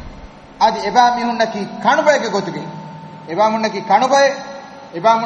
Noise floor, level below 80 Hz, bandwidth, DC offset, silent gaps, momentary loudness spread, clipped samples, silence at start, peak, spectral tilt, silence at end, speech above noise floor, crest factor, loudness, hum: -37 dBFS; -48 dBFS; 10 kHz; under 0.1%; none; 19 LU; under 0.1%; 0 s; 0 dBFS; -4 dB/octave; 0 s; 22 dB; 16 dB; -16 LUFS; none